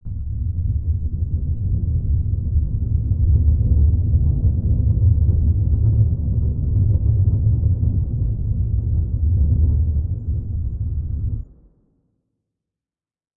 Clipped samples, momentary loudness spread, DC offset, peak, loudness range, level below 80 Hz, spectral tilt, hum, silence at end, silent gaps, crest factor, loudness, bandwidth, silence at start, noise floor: under 0.1%; 8 LU; 0.1%; -6 dBFS; 5 LU; -22 dBFS; -16.5 dB/octave; none; 1.9 s; none; 14 dB; -20 LUFS; 1 kHz; 0.05 s; under -90 dBFS